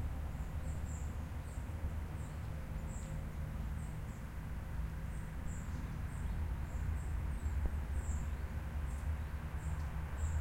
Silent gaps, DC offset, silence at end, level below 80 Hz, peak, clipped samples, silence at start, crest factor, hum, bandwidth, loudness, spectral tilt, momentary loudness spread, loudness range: none; under 0.1%; 0 s; -42 dBFS; -22 dBFS; under 0.1%; 0 s; 18 dB; none; 16.5 kHz; -43 LUFS; -6.5 dB/octave; 5 LU; 3 LU